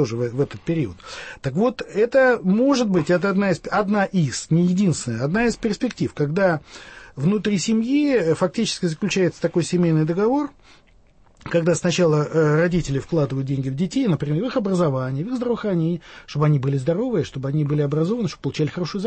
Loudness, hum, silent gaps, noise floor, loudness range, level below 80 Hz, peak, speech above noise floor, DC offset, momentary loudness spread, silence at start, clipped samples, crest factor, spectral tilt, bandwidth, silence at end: -21 LUFS; none; none; -53 dBFS; 3 LU; -50 dBFS; -6 dBFS; 32 dB; under 0.1%; 7 LU; 0 s; under 0.1%; 14 dB; -6.5 dB/octave; 8.8 kHz; 0 s